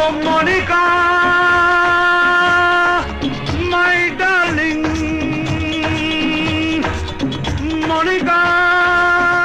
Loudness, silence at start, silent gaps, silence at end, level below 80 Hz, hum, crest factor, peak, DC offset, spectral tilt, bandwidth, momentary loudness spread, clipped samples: -14 LUFS; 0 s; none; 0 s; -34 dBFS; none; 10 dB; -6 dBFS; under 0.1%; -5 dB/octave; 12 kHz; 8 LU; under 0.1%